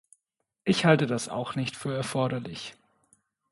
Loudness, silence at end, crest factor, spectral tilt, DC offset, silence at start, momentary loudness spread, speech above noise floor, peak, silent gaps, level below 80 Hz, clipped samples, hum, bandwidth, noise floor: -27 LUFS; 0.8 s; 24 dB; -5.5 dB/octave; under 0.1%; 0.65 s; 15 LU; 56 dB; -6 dBFS; none; -66 dBFS; under 0.1%; none; 11.5 kHz; -83 dBFS